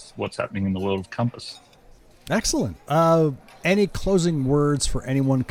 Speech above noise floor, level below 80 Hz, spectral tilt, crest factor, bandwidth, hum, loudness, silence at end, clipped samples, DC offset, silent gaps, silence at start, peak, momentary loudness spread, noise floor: 29 dB; -38 dBFS; -5.5 dB/octave; 16 dB; 16.5 kHz; none; -23 LUFS; 0.05 s; under 0.1%; under 0.1%; none; 0 s; -8 dBFS; 9 LU; -51 dBFS